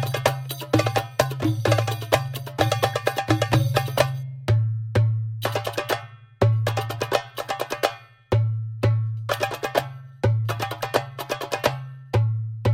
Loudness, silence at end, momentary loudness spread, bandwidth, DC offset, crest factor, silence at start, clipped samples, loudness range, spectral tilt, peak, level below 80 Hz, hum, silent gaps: -24 LUFS; 0 s; 7 LU; 16.5 kHz; under 0.1%; 22 dB; 0 s; under 0.1%; 3 LU; -5.5 dB/octave; -2 dBFS; -48 dBFS; none; none